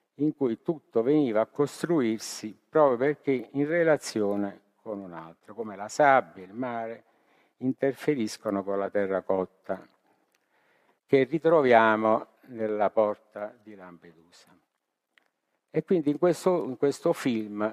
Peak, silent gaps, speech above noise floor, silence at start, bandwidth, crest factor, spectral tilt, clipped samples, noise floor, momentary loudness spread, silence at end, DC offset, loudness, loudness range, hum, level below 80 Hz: -6 dBFS; none; 55 dB; 0.2 s; 15 kHz; 22 dB; -6 dB/octave; under 0.1%; -81 dBFS; 17 LU; 0 s; under 0.1%; -27 LUFS; 7 LU; none; -76 dBFS